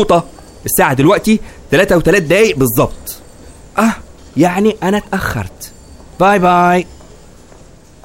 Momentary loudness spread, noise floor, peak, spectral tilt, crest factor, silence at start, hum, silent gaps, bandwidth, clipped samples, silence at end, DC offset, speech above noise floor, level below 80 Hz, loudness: 18 LU; -40 dBFS; 0 dBFS; -5 dB/octave; 14 dB; 0 s; none; none; 16.5 kHz; under 0.1%; 1.1 s; 0.3%; 29 dB; -34 dBFS; -12 LUFS